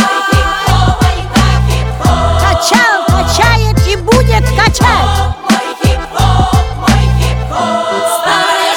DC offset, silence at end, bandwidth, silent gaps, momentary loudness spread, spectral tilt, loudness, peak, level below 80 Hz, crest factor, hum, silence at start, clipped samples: under 0.1%; 0 s; 19 kHz; none; 5 LU; -4.5 dB/octave; -10 LUFS; 0 dBFS; -16 dBFS; 10 dB; none; 0 s; under 0.1%